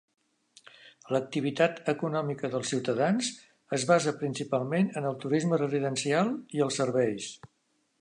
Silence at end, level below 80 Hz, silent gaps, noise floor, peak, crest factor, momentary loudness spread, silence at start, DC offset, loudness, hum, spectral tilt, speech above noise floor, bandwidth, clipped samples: 0.55 s; -76 dBFS; none; -74 dBFS; -10 dBFS; 20 dB; 7 LU; 0.85 s; under 0.1%; -29 LUFS; none; -5 dB/octave; 45 dB; 11 kHz; under 0.1%